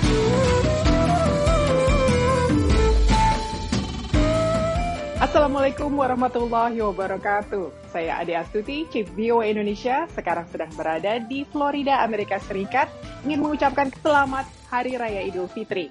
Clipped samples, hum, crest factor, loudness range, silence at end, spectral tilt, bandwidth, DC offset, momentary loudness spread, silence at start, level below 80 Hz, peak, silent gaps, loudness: under 0.1%; none; 16 dB; 5 LU; 0 s; -6 dB/octave; 11.5 kHz; under 0.1%; 8 LU; 0 s; -30 dBFS; -6 dBFS; none; -23 LUFS